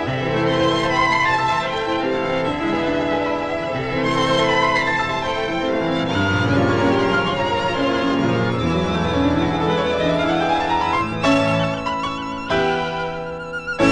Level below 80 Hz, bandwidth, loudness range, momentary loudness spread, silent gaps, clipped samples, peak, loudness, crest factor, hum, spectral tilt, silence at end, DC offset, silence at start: -42 dBFS; 10.5 kHz; 1 LU; 6 LU; none; under 0.1%; -4 dBFS; -19 LUFS; 16 dB; none; -5.5 dB/octave; 0 s; under 0.1%; 0 s